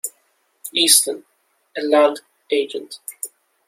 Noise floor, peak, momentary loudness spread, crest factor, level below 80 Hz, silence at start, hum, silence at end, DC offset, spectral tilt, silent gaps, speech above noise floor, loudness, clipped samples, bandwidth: -64 dBFS; 0 dBFS; 21 LU; 22 dB; -72 dBFS; 0.05 s; none; 0.4 s; under 0.1%; 0.5 dB/octave; none; 46 dB; -17 LUFS; under 0.1%; 16.5 kHz